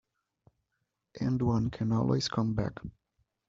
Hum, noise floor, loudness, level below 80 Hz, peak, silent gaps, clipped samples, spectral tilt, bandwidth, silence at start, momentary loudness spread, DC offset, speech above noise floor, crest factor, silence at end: none; -83 dBFS; -31 LUFS; -54 dBFS; -16 dBFS; none; under 0.1%; -7 dB/octave; 7.6 kHz; 1.15 s; 10 LU; under 0.1%; 53 dB; 18 dB; 0.6 s